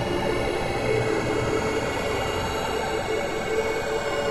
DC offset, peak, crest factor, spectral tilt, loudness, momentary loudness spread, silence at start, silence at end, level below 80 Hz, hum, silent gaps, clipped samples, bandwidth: under 0.1%; -12 dBFS; 12 dB; -4.5 dB/octave; -25 LUFS; 2 LU; 0 s; 0 s; -40 dBFS; none; none; under 0.1%; 15 kHz